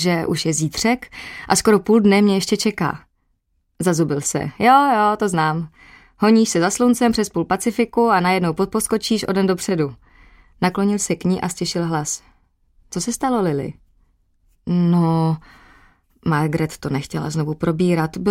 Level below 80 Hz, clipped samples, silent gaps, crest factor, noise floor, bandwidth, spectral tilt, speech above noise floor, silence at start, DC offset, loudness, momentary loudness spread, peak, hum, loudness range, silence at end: -48 dBFS; under 0.1%; none; 18 dB; -67 dBFS; 16.5 kHz; -5 dB/octave; 49 dB; 0 s; under 0.1%; -19 LUFS; 11 LU; -2 dBFS; none; 6 LU; 0 s